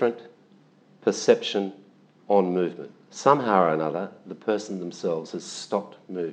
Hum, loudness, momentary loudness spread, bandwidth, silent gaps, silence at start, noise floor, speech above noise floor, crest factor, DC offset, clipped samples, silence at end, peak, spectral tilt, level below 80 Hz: none; -25 LUFS; 13 LU; 9.4 kHz; none; 0 s; -57 dBFS; 32 dB; 24 dB; under 0.1%; under 0.1%; 0 s; -2 dBFS; -5 dB/octave; -88 dBFS